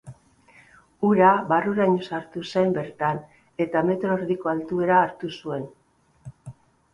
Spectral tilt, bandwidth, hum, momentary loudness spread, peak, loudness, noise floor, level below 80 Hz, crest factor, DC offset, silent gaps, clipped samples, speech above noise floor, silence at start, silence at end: -7.5 dB/octave; 10.5 kHz; none; 16 LU; -4 dBFS; -23 LUFS; -55 dBFS; -62 dBFS; 20 dB; under 0.1%; none; under 0.1%; 33 dB; 0.05 s; 0.4 s